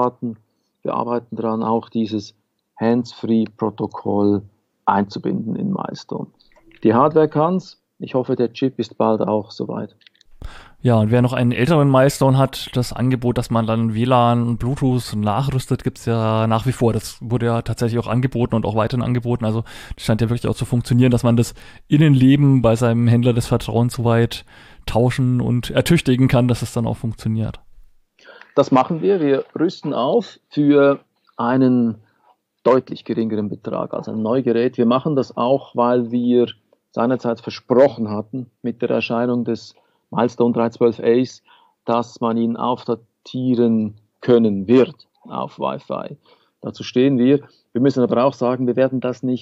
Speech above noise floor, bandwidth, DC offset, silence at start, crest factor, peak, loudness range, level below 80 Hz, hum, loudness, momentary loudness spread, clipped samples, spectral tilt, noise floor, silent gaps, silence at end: 42 dB; 14.5 kHz; under 0.1%; 0 s; 16 dB; -2 dBFS; 5 LU; -44 dBFS; none; -19 LUFS; 12 LU; under 0.1%; -7.5 dB/octave; -59 dBFS; none; 0 s